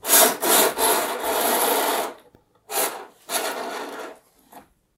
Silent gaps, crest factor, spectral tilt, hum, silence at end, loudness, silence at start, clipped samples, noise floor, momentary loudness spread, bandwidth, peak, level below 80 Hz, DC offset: none; 24 dB; 0 dB/octave; none; 0.4 s; -20 LUFS; 0.05 s; under 0.1%; -56 dBFS; 18 LU; 17.5 kHz; 0 dBFS; -66 dBFS; under 0.1%